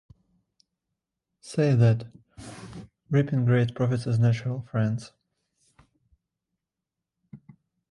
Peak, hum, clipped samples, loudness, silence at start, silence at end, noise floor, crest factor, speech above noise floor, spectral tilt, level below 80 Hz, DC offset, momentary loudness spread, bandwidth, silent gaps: -8 dBFS; none; under 0.1%; -25 LUFS; 1.45 s; 0.55 s; -87 dBFS; 20 dB; 64 dB; -8 dB/octave; -60 dBFS; under 0.1%; 22 LU; 11 kHz; none